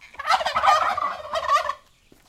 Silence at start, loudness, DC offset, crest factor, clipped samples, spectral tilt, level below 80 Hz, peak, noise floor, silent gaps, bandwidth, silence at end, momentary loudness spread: 0 s; -22 LUFS; under 0.1%; 20 dB; under 0.1%; -1 dB/octave; -56 dBFS; -4 dBFS; -56 dBFS; none; 16 kHz; 0.5 s; 10 LU